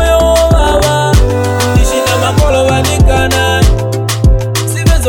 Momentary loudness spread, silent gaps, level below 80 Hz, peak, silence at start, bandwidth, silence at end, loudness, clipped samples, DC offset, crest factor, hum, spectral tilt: 4 LU; none; -14 dBFS; 0 dBFS; 0 s; 17.5 kHz; 0 s; -10 LUFS; under 0.1%; under 0.1%; 8 dB; none; -5 dB/octave